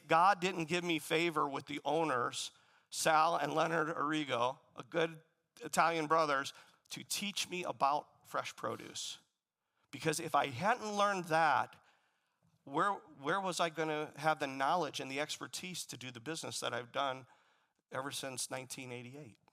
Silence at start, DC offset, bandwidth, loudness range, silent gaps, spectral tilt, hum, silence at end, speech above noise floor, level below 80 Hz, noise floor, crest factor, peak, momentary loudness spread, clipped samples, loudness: 0.05 s; under 0.1%; 16 kHz; 7 LU; none; -3.5 dB/octave; none; 0.2 s; 51 dB; -86 dBFS; -87 dBFS; 22 dB; -14 dBFS; 13 LU; under 0.1%; -36 LUFS